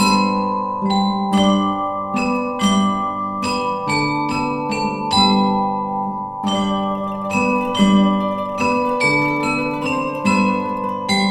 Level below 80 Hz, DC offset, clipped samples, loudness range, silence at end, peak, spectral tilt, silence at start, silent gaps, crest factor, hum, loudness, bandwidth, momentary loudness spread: -48 dBFS; under 0.1%; under 0.1%; 2 LU; 0 s; -2 dBFS; -5 dB/octave; 0 s; none; 16 dB; none; -18 LUFS; 13.5 kHz; 7 LU